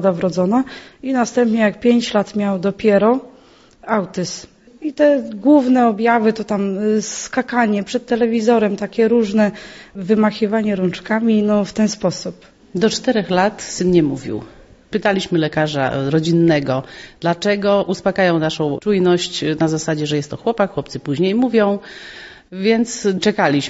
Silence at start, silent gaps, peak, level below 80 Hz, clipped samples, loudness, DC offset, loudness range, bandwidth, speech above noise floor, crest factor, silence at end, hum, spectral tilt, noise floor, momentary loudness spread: 0 s; none; -2 dBFS; -52 dBFS; under 0.1%; -17 LUFS; under 0.1%; 2 LU; 8 kHz; 31 dB; 16 dB; 0 s; none; -5.5 dB/octave; -47 dBFS; 11 LU